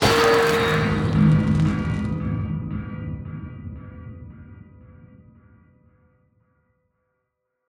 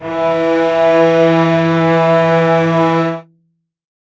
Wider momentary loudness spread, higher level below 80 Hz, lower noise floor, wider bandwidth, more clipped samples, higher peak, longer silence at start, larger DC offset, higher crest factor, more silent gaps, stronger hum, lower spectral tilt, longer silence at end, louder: first, 23 LU vs 6 LU; first, -40 dBFS vs -52 dBFS; first, -77 dBFS vs -63 dBFS; first, 19.5 kHz vs 7.8 kHz; neither; about the same, -2 dBFS vs 0 dBFS; about the same, 0 s vs 0 s; neither; first, 20 dB vs 12 dB; neither; neither; second, -6 dB/octave vs -7.5 dB/octave; first, 2.75 s vs 0.85 s; second, -21 LUFS vs -12 LUFS